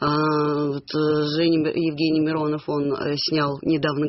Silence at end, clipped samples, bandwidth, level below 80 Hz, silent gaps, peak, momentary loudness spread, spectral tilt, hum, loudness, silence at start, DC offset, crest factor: 0 s; under 0.1%; 6 kHz; -58 dBFS; none; -8 dBFS; 4 LU; -5 dB/octave; none; -22 LUFS; 0 s; under 0.1%; 14 dB